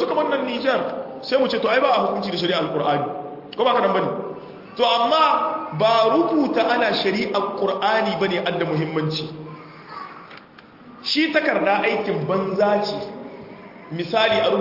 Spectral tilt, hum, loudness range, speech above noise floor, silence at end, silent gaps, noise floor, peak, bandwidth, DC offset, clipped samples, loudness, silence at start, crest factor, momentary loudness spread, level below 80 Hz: -6 dB/octave; none; 5 LU; 25 dB; 0 s; none; -45 dBFS; -6 dBFS; 5.8 kHz; under 0.1%; under 0.1%; -20 LUFS; 0 s; 16 dB; 18 LU; -64 dBFS